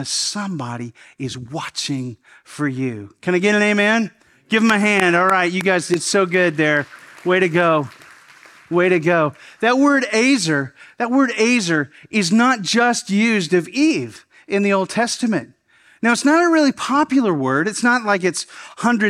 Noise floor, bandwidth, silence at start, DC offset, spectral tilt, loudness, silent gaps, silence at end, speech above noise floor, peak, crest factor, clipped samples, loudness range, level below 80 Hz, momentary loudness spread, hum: -46 dBFS; 14 kHz; 0 s; under 0.1%; -4.5 dB/octave; -17 LUFS; none; 0 s; 28 dB; 0 dBFS; 18 dB; under 0.1%; 3 LU; -66 dBFS; 13 LU; none